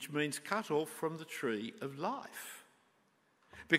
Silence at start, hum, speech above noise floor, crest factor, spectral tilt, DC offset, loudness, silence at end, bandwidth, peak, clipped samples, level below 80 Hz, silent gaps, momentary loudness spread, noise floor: 0 s; none; 35 dB; 26 dB; -4 dB/octave; under 0.1%; -39 LUFS; 0 s; 16 kHz; -12 dBFS; under 0.1%; -80 dBFS; none; 15 LU; -73 dBFS